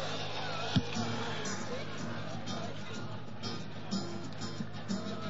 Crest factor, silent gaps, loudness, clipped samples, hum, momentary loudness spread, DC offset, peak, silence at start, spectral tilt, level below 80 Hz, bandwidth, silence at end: 22 dB; none; -38 LUFS; under 0.1%; none; 9 LU; 1%; -16 dBFS; 0 s; -4 dB/octave; -62 dBFS; 7.6 kHz; 0 s